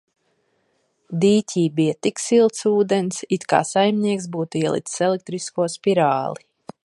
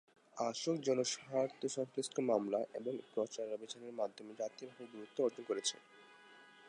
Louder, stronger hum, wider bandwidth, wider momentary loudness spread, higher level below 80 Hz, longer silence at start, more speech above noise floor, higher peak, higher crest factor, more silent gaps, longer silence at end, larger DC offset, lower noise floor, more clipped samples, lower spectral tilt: first, -20 LUFS vs -40 LUFS; neither; about the same, 11.5 kHz vs 11 kHz; second, 8 LU vs 16 LU; first, -66 dBFS vs under -90 dBFS; first, 1.1 s vs 0.35 s; first, 48 dB vs 22 dB; first, -2 dBFS vs -20 dBFS; about the same, 20 dB vs 20 dB; neither; first, 0.5 s vs 0 s; neither; first, -67 dBFS vs -61 dBFS; neither; first, -5 dB/octave vs -3.5 dB/octave